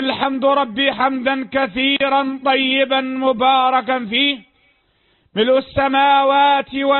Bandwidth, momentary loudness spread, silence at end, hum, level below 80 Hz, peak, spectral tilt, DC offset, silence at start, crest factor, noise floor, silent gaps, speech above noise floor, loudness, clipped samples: 4.3 kHz; 6 LU; 0 s; none; -52 dBFS; -4 dBFS; -9 dB/octave; under 0.1%; 0 s; 14 dB; -60 dBFS; none; 44 dB; -16 LUFS; under 0.1%